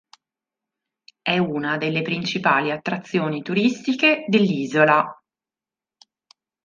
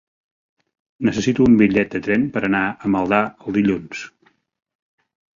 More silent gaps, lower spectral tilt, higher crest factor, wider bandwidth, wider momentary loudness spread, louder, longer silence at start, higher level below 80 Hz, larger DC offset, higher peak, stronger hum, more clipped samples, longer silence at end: neither; about the same, -6 dB/octave vs -6.5 dB/octave; about the same, 22 dB vs 18 dB; about the same, 7.4 kHz vs 7.4 kHz; second, 8 LU vs 11 LU; second, -21 LUFS vs -18 LUFS; first, 1.25 s vs 1 s; second, -68 dBFS vs -50 dBFS; neither; about the same, -2 dBFS vs -2 dBFS; neither; neither; first, 1.5 s vs 1.3 s